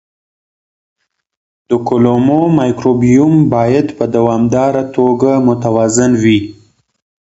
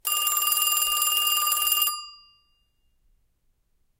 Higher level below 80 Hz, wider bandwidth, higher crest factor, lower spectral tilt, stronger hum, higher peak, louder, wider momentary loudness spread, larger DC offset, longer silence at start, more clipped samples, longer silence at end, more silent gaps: first, -44 dBFS vs -64 dBFS; second, 8.2 kHz vs 17.5 kHz; second, 12 dB vs 20 dB; first, -6.5 dB/octave vs 5 dB/octave; neither; first, 0 dBFS vs -8 dBFS; first, -11 LUFS vs -21 LUFS; first, 5 LU vs 2 LU; neither; first, 1.7 s vs 0.05 s; neither; second, 0.7 s vs 1.85 s; neither